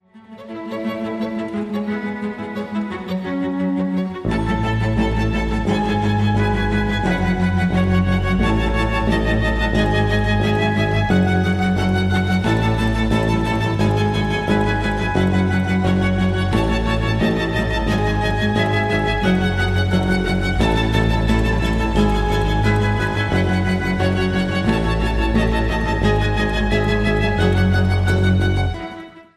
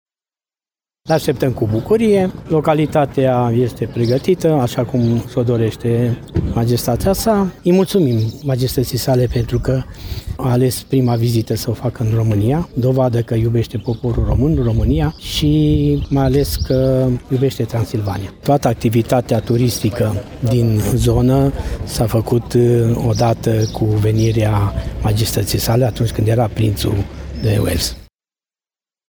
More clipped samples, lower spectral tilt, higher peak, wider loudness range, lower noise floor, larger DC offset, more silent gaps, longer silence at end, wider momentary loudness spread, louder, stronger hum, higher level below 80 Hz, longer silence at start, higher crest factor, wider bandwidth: neither; about the same, -7 dB/octave vs -7 dB/octave; about the same, -2 dBFS vs 0 dBFS; about the same, 3 LU vs 2 LU; second, -39 dBFS vs under -90 dBFS; neither; neither; second, 0.15 s vs 1.1 s; about the same, 7 LU vs 6 LU; second, -19 LUFS vs -16 LUFS; neither; about the same, -26 dBFS vs -30 dBFS; second, 0.15 s vs 1.05 s; about the same, 16 dB vs 14 dB; second, 13 kHz vs over 20 kHz